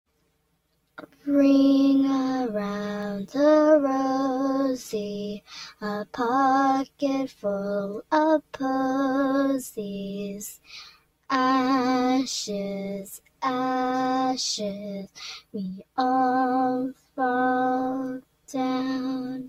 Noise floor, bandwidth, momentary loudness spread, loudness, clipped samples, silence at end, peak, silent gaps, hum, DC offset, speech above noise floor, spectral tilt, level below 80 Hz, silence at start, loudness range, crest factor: -71 dBFS; 14.5 kHz; 15 LU; -25 LUFS; under 0.1%; 0 s; -8 dBFS; none; none; under 0.1%; 46 dB; -5 dB/octave; -66 dBFS; 1 s; 5 LU; 16 dB